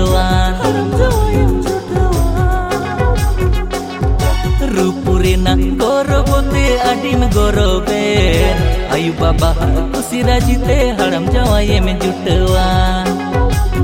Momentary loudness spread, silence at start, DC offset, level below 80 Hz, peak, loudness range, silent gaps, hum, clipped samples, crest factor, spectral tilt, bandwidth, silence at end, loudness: 4 LU; 0 s; under 0.1%; -16 dBFS; 0 dBFS; 2 LU; none; none; under 0.1%; 12 dB; -6 dB/octave; 16.5 kHz; 0 s; -14 LUFS